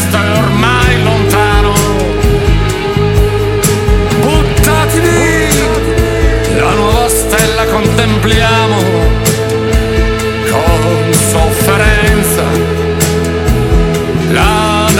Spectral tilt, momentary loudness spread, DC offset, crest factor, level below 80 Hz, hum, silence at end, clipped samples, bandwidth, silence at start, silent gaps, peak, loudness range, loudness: -5 dB/octave; 3 LU; under 0.1%; 10 dB; -16 dBFS; none; 0 s; under 0.1%; 17 kHz; 0 s; none; 0 dBFS; 1 LU; -10 LUFS